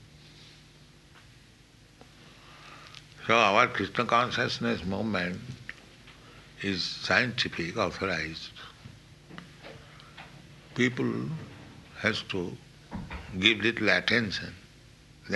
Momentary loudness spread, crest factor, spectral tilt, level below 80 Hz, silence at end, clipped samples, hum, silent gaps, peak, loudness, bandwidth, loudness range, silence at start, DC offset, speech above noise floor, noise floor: 24 LU; 26 dB; -4.5 dB/octave; -56 dBFS; 0 s; under 0.1%; none; none; -4 dBFS; -27 LUFS; 12 kHz; 8 LU; 0 s; under 0.1%; 28 dB; -56 dBFS